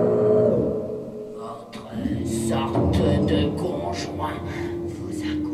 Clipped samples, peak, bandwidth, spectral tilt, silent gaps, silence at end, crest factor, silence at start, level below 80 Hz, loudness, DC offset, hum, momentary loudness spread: under 0.1%; -6 dBFS; 14 kHz; -7 dB/octave; none; 0 s; 16 dB; 0 s; -44 dBFS; -24 LUFS; under 0.1%; none; 15 LU